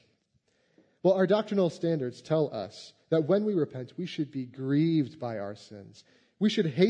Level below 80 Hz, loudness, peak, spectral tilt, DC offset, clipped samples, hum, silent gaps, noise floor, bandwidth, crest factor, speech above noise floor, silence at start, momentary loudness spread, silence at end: -78 dBFS; -29 LUFS; -10 dBFS; -7.5 dB/octave; under 0.1%; under 0.1%; none; none; -72 dBFS; 9.6 kHz; 20 dB; 44 dB; 1.05 s; 14 LU; 0 s